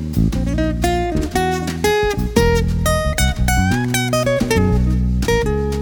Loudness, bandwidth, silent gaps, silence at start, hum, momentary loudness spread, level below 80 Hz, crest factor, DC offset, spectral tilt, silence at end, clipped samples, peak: -17 LUFS; over 20 kHz; none; 0 s; none; 3 LU; -22 dBFS; 16 dB; under 0.1%; -5.5 dB/octave; 0 s; under 0.1%; 0 dBFS